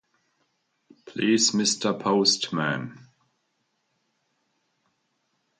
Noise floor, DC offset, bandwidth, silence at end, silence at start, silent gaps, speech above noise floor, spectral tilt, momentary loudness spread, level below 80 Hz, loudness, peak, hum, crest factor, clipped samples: -75 dBFS; under 0.1%; 9.8 kHz; 2.65 s; 1.05 s; none; 51 dB; -3 dB/octave; 12 LU; -74 dBFS; -23 LUFS; -8 dBFS; none; 20 dB; under 0.1%